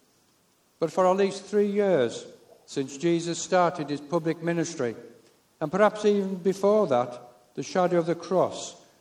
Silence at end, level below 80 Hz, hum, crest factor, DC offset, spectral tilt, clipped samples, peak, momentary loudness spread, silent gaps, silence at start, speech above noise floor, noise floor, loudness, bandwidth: 0.25 s; -74 dBFS; none; 20 dB; under 0.1%; -5.5 dB/octave; under 0.1%; -8 dBFS; 13 LU; none; 0.8 s; 40 dB; -65 dBFS; -26 LUFS; 12.5 kHz